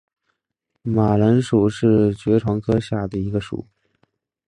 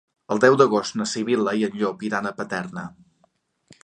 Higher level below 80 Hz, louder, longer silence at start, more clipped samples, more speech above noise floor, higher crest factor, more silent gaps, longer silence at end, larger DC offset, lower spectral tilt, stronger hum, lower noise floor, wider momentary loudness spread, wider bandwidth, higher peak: first, -46 dBFS vs -66 dBFS; first, -19 LUFS vs -22 LUFS; first, 0.85 s vs 0.3 s; neither; first, 59 dB vs 44 dB; second, 16 dB vs 22 dB; neither; first, 0.85 s vs 0.1 s; neither; first, -8.5 dB/octave vs -5 dB/octave; neither; first, -77 dBFS vs -66 dBFS; second, 10 LU vs 13 LU; about the same, 10.5 kHz vs 9.8 kHz; about the same, -4 dBFS vs -2 dBFS